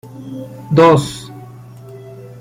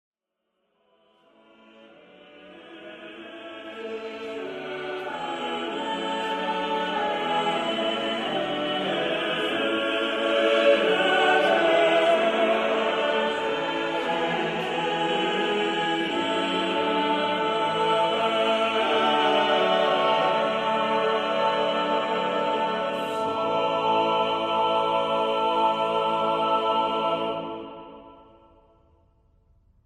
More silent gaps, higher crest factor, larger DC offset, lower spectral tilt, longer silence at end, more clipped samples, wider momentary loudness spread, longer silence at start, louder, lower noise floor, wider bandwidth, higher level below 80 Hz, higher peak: neither; about the same, 16 dB vs 16 dB; neither; first, -6.5 dB/octave vs -4.5 dB/octave; second, 0.15 s vs 1.7 s; neither; first, 26 LU vs 12 LU; second, 0.15 s vs 1.8 s; first, -12 LUFS vs -24 LUFS; second, -36 dBFS vs -80 dBFS; first, 16 kHz vs 13 kHz; first, -50 dBFS vs -64 dBFS; first, -2 dBFS vs -8 dBFS